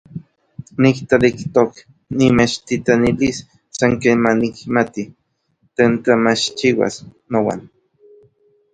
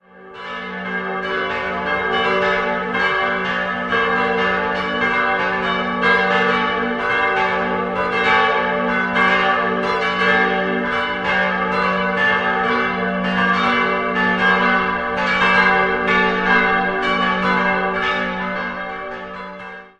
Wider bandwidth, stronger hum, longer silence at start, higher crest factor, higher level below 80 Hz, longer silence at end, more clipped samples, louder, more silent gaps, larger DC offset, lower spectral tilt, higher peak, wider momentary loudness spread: about the same, 9.2 kHz vs 9.6 kHz; neither; about the same, 0.15 s vs 0.15 s; about the same, 18 dB vs 18 dB; about the same, -48 dBFS vs -46 dBFS; first, 1.1 s vs 0.1 s; neither; about the same, -17 LUFS vs -17 LUFS; neither; neither; about the same, -5.5 dB/octave vs -5.5 dB/octave; about the same, 0 dBFS vs -2 dBFS; first, 17 LU vs 8 LU